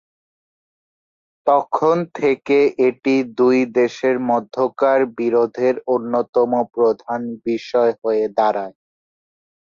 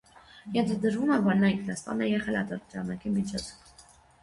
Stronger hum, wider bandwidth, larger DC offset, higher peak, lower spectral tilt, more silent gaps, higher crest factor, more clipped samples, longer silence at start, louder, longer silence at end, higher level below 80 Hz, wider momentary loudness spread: neither; second, 7.2 kHz vs 11.5 kHz; neither; first, -4 dBFS vs -12 dBFS; about the same, -6.5 dB/octave vs -6 dB/octave; first, 6.29-6.33 s vs none; about the same, 16 dB vs 18 dB; neither; first, 1.45 s vs 0.35 s; first, -18 LUFS vs -29 LUFS; first, 1.05 s vs 0.4 s; second, -66 dBFS vs -58 dBFS; second, 7 LU vs 12 LU